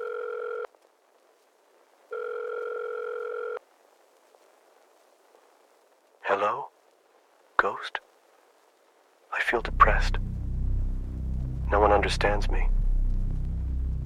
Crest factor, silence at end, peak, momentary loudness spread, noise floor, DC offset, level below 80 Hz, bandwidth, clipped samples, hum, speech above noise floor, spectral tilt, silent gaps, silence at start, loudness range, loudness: 26 dB; 0 s; -4 dBFS; 15 LU; -63 dBFS; under 0.1%; -32 dBFS; 10.5 kHz; under 0.1%; none; 39 dB; -5.5 dB/octave; none; 0 s; 11 LU; -29 LUFS